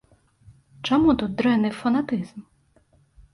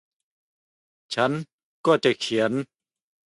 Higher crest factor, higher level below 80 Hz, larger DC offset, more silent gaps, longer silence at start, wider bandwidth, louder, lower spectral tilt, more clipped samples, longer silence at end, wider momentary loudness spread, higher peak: second, 16 dB vs 22 dB; first, -50 dBFS vs -70 dBFS; neither; second, none vs 1.53-1.84 s; second, 0.85 s vs 1.1 s; about the same, 11.5 kHz vs 11.5 kHz; about the same, -22 LUFS vs -24 LUFS; first, -6.5 dB/octave vs -5 dB/octave; neither; first, 0.9 s vs 0.6 s; about the same, 12 LU vs 13 LU; second, -8 dBFS vs -4 dBFS